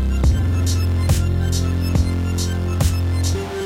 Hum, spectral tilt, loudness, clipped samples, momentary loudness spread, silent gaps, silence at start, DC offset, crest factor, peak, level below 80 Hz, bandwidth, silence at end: none; -6 dB/octave; -20 LUFS; under 0.1%; 3 LU; none; 0 s; under 0.1%; 14 dB; -4 dBFS; -24 dBFS; 16 kHz; 0 s